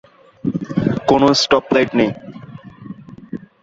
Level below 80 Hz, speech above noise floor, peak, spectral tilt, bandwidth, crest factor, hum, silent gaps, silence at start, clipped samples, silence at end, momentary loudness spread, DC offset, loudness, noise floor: -48 dBFS; 21 dB; -2 dBFS; -5 dB/octave; 7.8 kHz; 16 dB; none; none; 0.45 s; under 0.1%; 0.25 s; 23 LU; under 0.1%; -16 LUFS; -36 dBFS